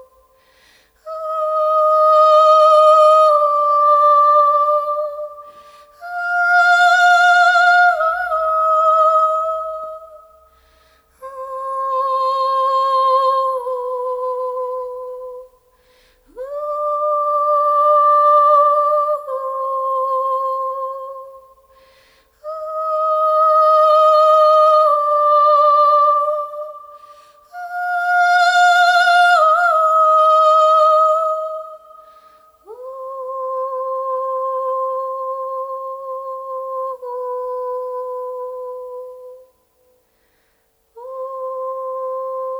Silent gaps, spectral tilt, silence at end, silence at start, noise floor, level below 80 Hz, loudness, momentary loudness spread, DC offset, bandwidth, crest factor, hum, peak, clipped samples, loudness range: none; 1 dB/octave; 0 s; 1.05 s; -62 dBFS; -64 dBFS; -14 LUFS; 18 LU; under 0.1%; 12.5 kHz; 14 dB; none; -2 dBFS; under 0.1%; 14 LU